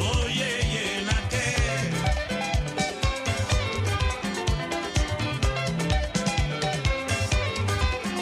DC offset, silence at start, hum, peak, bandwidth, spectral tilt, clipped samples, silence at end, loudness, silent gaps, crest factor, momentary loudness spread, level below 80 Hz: under 0.1%; 0 s; none; -10 dBFS; 14 kHz; -4.5 dB/octave; under 0.1%; 0 s; -26 LUFS; none; 16 dB; 3 LU; -32 dBFS